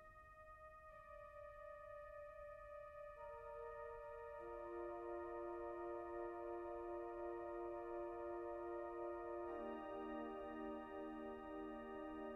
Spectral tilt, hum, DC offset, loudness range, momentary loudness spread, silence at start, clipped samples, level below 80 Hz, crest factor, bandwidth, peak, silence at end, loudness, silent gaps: -7.5 dB/octave; none; under 0.1%; 6 LU; 8 LU; 0 s; under 0.1%; -70 dBFS; 12 dB; 6 kHz; -38 dBFS; 0 s; -51 LUFS; none